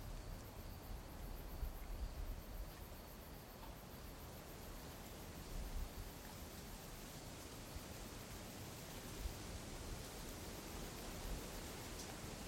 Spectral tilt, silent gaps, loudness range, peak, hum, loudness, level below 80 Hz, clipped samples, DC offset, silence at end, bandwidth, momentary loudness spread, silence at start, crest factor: -4 dB/octave; none; 3 LU; -34 dBFS; none; -52 LUFS; -54 dBFS; under 0.1%; under 0.1%; 0 s; 16.5 kHz; 5 LU; 0 s; 16 dB